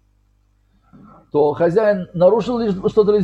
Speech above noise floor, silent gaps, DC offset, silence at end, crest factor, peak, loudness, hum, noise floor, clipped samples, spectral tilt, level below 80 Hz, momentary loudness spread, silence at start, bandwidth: 43 dB; none; under 0.1%; 0 s; 16 dB; -2 dBFS; -17 LUFS; 50 Hz at -50 dBFS; -59 dBFS; under 0.1%; -8 dB/octave; -50 dBFS; 5 LU; 1.35 s; 7.8 kHz